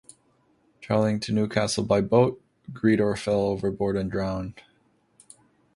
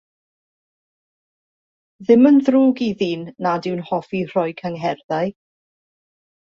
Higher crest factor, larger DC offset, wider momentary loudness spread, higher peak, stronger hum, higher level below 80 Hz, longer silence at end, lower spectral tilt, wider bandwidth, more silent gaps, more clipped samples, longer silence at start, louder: about the same, 20 dB vs 18 dB; neither; second, 9 LU vs 12 LU; second, -6 dBFS vs -2 dBFS; neither; first, -52 dBFS vs -64 dBFS; about the same, 1.15 s vs 1.25 s; second, -6 dB/octave vs -7.5 dB/octave; first, 11.5 kHz vs 7 kHz; second, none vs 5.04-5.09 s; neither; second, 0.8 s vs 2 s; second, -25 LUFS vs -19 LUFS